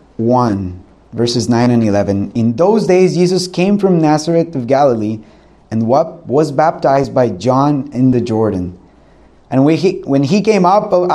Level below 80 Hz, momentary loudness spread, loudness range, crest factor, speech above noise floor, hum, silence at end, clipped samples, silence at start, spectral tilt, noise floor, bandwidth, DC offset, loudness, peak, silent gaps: -48 dBFS; 8 LU; 2 LU; 12 dB; 32 dB; none; 0 s; under 0.1%; 0.2 s; -7 dB/octave; -45 dBFS; 12 kHz; under 0.1%; -13 LUFS; 0 dBFS; none